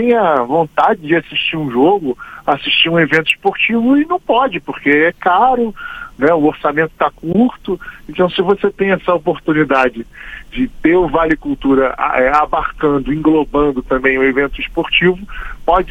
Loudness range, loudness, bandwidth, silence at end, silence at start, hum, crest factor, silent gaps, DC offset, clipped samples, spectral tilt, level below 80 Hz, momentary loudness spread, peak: 2 LU; -14 LUFS; 9.2 kHz; 0 s; 0 s; none; 14 dB; none; under 0.1%; under 0.1%; -6.5 dB/octave; -36 dBFS; 9 LU; 0 dBFS